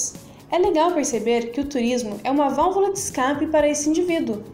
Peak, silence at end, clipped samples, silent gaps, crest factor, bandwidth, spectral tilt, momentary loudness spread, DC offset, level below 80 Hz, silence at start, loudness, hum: -8 dBFS; 0 s; under 0.1%; none; 12 dB; 16 kHz; -3.5 dB/octave; 5 LU; under 0.1%; -50 dBFS; 0 s; -21 LUFS; none